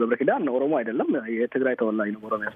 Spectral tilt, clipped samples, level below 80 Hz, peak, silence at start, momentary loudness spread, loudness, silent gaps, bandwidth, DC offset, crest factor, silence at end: -9.5 dB/octave; under 0.1%; -74 dBFS; -8 dBFS; 0 s; 5 LU; -25 LUFS; none; 3.8 kHz; under 0.1%; 16 dB; 0 s